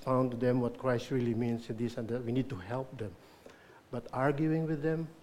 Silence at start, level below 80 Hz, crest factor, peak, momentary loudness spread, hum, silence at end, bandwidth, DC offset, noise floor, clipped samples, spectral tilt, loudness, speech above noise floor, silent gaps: 0 s; -60 dBFS; 18 dB; -16 dBFS; 11 LU; none; 0 s; 14 kHz; under 0.1%; -56 dBFS; under 0.1%; -8 dB/octave; -34 LUFS; 23 dB; none